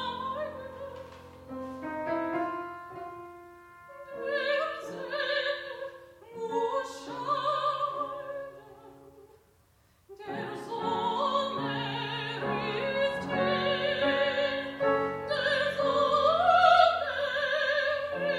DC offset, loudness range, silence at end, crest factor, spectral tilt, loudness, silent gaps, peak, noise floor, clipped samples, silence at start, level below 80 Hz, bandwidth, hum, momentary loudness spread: under 0.1%; 12 LU; 0 s; 22 dB; -4.5 dB/octave; -29 LUFS; none; -10 dBFS; -65 dBFS; under 0.1%; 0 s; -68 dBFS; 13 kHz; none; 18 LU